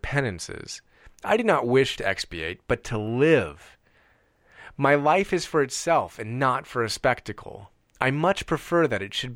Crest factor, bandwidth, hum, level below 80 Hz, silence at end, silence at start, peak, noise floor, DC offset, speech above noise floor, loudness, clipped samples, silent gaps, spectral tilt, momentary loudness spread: 22 dB; 16.5 kHz; none; -50 dBFS; 0 s; 0.05 s; -4 dBFS; -62 dBFS; under 0.1%; 37 dB; -24 LUFS; under 0.1%; none; -5 dB/octave; 15 LU